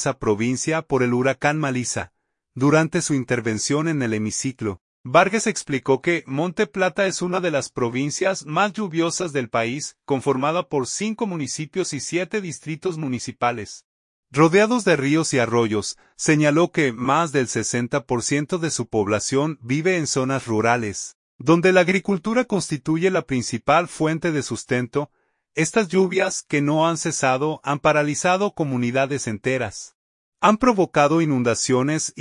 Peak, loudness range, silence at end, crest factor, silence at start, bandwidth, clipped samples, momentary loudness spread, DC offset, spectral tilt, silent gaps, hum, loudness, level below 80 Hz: -2 dBFS; 3 LU; 0 s; 20 dB; 0 s; 11 kHz; under 0.1%; 9 LU; under 0.1%; -4.5 dB/octave; 4.81-5.04 s, 13.84-14.23 s, 21.15-21.39 s, 29.95-30.32 s; none; -21 LUFS; -56 dBFS